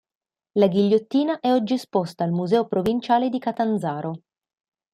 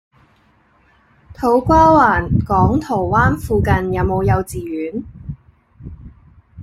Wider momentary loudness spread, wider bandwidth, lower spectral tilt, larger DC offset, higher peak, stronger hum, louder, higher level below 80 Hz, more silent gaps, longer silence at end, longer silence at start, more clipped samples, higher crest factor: second, 8 LU vs 23 LU; about the same, 14.5 kHz vs 15.5 kHz; about the same, -7.5 dB/octave vs -8 dB/octave; neither; second, -6 dBFS vs -2 dBFS; neither; second, -22 LUFS vs -15 LUFS; second, -62 dBFS vs -32 dBFS; neither; first, 0.75 s vs 0 s; second, 0.55 s vs 1.3 s; neither; about the same, 18 dB vs 16 dB